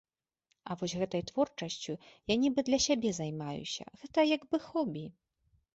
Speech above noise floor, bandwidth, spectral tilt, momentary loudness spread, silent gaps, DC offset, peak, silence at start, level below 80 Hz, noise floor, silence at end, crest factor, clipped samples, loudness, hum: 47 dB; 8.2 kHz; -4.5 dB/octave; 13 LU; none; under 0.1%; -16 dBFS; 0.65 s; -64 dBFS; -80 dBFS; 0.65 s; 18 dB; under 0.1%; -33 LUFS; none